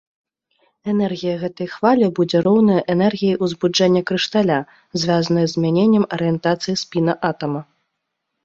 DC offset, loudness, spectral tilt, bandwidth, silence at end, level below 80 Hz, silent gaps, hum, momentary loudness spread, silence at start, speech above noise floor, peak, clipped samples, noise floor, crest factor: under 0.1%; -18 LUFS; -6 dB/octave; 7.8 kHz; 0.8 s; -58 dBFS; none; none; 8 LU; 0.85 s; 59 dB; -2 dBFS; under 0.1%; -76 dBFS; 16 dB